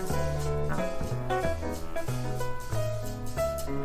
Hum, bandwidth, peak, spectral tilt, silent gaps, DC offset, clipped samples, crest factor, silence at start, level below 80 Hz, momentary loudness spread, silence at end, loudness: none; 16 kHz; -14 dBFS; -6 dB/octave; none; under 0.1%; under 0.1%; 14 dB; 0 s; -40 dBFS; 5 LU; 0 s; -32 LUFS